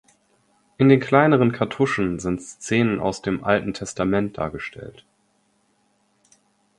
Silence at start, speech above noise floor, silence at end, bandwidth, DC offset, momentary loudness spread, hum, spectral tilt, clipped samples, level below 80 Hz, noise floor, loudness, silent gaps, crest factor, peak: 0.8 s; 45 dB; 1.9 s; 11.5 kHz; under 0.1%; 14 LU; none; -6.5 dB/octave; under 0.1%; -50 dBFS; -65 dBFS; -21 LUFS; none; 22 dB; 0 dBFS